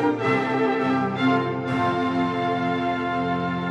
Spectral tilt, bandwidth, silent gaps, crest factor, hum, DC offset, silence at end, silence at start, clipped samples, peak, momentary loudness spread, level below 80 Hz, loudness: -7 dB/octave; 8.8 kHz; none; 14 dB; none; under 0.1%; 0 s; 0 s; under 0.1%; -10 dBFS; 3 LU; -60 dBFS; -23 LUFS